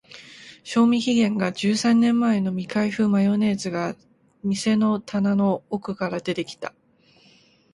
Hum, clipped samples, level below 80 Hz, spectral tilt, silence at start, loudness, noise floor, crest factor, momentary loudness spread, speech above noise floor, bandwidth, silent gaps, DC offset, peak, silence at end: none; under 0.1%; -64 dBFS; -6 dB/octave; 0.15 s; -22 LUFS; -57 dBFS; 14 dB; 15 LU; 36 dB; 11.5 kHz; none; under 0.1%; -8 dBFS; 1.05 s